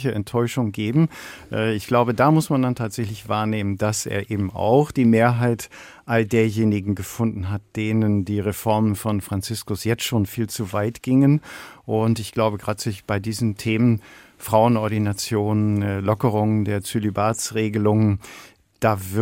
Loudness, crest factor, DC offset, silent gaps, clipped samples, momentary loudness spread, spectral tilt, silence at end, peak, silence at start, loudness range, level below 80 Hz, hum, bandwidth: -22 LUFS; 18 dB; under 0.1%; none; under 0.1%; 9 LU; -6.5 dB/octave; 0 s; -2 dBFS; 0 s; 2 LU; -54 dBFS; none; 17 kHz